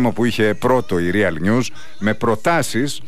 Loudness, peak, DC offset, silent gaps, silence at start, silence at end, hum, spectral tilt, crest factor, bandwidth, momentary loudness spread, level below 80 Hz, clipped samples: -18 LUFS; -6 dBFS; 5%; none; 0 s; 0.1 s; none; -5.5 dB/octave; 12 dB; 15.5 kHz; 4 LU; -46 dBFS; under 0.1%